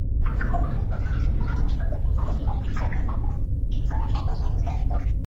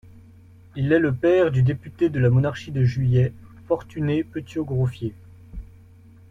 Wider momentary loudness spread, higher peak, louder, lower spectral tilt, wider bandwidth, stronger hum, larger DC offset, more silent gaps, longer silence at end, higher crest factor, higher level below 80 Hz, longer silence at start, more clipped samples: second, 2 LU vs 15 LU; second, -12 dBFS vs -6 dBFS; second, -28 LUFS vs -22 LUFS; about the same, -8.5 dB/octave vs -9 dB/octave; second, 6.2 kHz vs 7.2 kHz; neither; neither; neither; second, 0 s vs 0.65 s; about the same, 12 dB vs 16 dB; first, -24 dBFS vs -46 dBFS; second, 0 s vs 0.15 s; neither